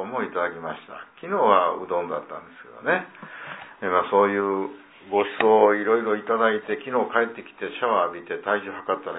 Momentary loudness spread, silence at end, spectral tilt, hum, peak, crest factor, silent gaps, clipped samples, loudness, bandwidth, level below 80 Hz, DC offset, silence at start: 18 LU; 0 s; -9 dB/octave; none; -4 dBFS; 20 dB; none; under 0.1%; -23 LUFS; 4 kHz; -72 dBFS; under 0.1%; 0 s